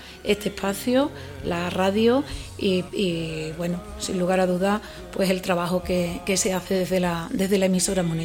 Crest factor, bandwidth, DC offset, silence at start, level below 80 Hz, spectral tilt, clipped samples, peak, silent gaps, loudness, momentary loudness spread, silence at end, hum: 18 dB; 17.5 kHz; under 0.1%; 0 s; -44 dBFS; -4.5 dB/octave; under 0.1%; -6 dBFS; none; -24 LUFS; 8 LU; 0 s; none